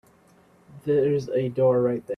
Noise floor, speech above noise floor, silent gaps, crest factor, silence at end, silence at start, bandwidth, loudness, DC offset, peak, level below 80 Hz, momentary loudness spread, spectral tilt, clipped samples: -57 dBFS; 35 dB; none; 16 dB; 0 s; 0.7 s; 6.4 kHz; -23 LUFS; under 0.1%; -10 dBFS; -64 dBFS; 5 LU; -8.5 dB/octave; under 0.1%